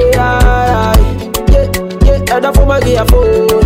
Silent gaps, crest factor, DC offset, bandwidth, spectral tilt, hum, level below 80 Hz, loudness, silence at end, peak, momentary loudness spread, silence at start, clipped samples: none; 8 dB; under 0.1%; 16.5 kHz; -6 dB/octave; none; -12 dBFS; -10 LUFS; 0 s; 0 dBFS; 3 LU; 0 s; under 0.1%